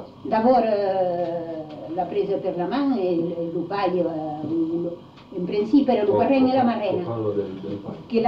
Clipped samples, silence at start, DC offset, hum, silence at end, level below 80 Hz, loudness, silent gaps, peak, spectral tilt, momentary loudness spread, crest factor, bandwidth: under 0.1%; 0 s; under 0.1%; none; 0 s; -60 dBFS; -23 LUFS; none; -8 dBFS; -9 dB/octave; 13 LU; 14 dB; 6 kHz